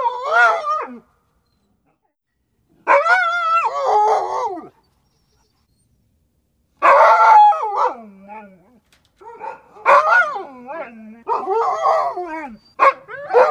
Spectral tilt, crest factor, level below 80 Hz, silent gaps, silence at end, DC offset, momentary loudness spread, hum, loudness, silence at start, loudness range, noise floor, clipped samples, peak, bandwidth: -2.5 dB/octave; 16 dB; -66 dBFS; none; 0 s; under 0.1%; 23 LU; none; -15 LUFS; 0 s; 5 LU; -71 dBFS; under 0.1%; -2 dBFS; 10.5 kHz